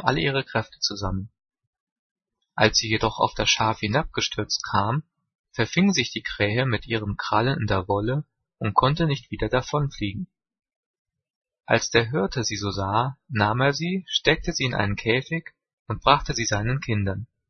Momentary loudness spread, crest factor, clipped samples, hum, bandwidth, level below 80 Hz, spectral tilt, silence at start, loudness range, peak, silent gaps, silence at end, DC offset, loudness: 10 LU; 24 dB; under 0.1%; none; 6.6 kHz; -44 dBFS; -4.5 dB/octave; 0 s; 3 LU; 0 dBFS; 1.67-1.73 s, 1.80-2.16 s, 5.35-5.44 s, 10.76-11.05 s, 11.30-11.42 s, 15.73-15.85 s; 0.25 s; under 0.1%; -24 LUFS